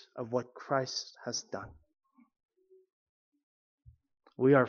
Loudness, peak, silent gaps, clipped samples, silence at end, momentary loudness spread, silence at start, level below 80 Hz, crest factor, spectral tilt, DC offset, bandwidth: -34 LUFS; -12 dBFS; 2.45-2.49 s, 2.93-3.32 s, 3.43-3.78 s; under 0.1%; 0 s; 14 LU; 0.15 s; -70 dBFS; 22 dB; -4.5 dB/octave; under 0.1%; 7.2 kHz